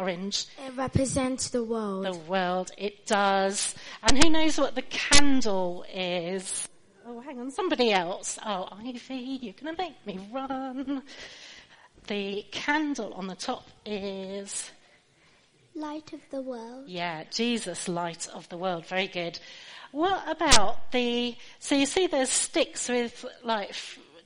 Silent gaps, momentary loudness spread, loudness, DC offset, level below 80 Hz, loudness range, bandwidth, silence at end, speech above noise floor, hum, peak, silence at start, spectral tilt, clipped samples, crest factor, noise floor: none; 16 LU; -28 LUFS; under 0.1%; -44 dBFS; 11 LU; 10.5 kHz; 0 s; 36 dB; none; 0 dBFS; 0 s; -3 dB/octave; under 0.1%; 26 dB; -62 dBFS